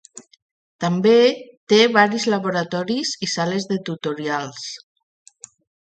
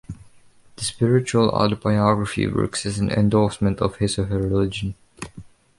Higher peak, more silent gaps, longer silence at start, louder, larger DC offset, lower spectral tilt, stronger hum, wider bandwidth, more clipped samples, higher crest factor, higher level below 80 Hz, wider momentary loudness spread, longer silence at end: first, 0 dBFS vs -4 dBFS; first, 0.42-0.79 s, 1.57-1.67 s vs none; about the same, 0.15 s vs 0.1 s; about the same, -19 LUFS vs -21 LUFS; neither; second, -4.5 dB/octave vs -6 dB/octave; neither; second, 9.2 kHz vs 11.5 kHz; neither; about the same, 20 dB vs 18 dB; second, -68 dBFS vs -42 dBFS; second, 15 LU vs 19 LU; first, 1.05 s vs 0.3 s